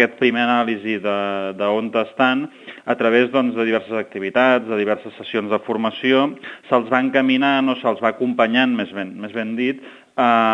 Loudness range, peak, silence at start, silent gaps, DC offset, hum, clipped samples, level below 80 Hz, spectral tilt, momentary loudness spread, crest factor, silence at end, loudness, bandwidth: 2 LU; 0 dBFS; 0 s; none; under 0.1%; none; under 0.1%; -72 dBFS; -6.5 dB/octave; 9 LU; 18 dB; 0 s; -19 LUFS; 7.2 kHz